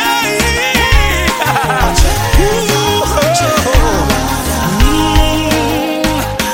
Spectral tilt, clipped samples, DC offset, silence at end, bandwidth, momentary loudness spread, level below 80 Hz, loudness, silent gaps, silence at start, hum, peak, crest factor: -4 dB/octave; 0.2%; under 0.1%; 0 s; 17 kHz; 4 LU; -16 dBFS; -12 LUFS; none; 0 s; none; 0 dBFS; 12 dB